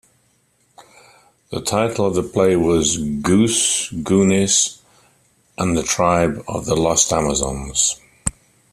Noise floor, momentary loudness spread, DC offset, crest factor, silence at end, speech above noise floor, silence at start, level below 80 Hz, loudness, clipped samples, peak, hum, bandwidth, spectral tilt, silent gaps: -61 dBFS; 10 LU; under 0.1%; 20 dB; 0.4 s; 44 dB; 0.8 s; -42 dBFS; -18 LUFS; under 0.1%; 0 dBFS; none; 14.5 kHz; -3.5 dB/octave; none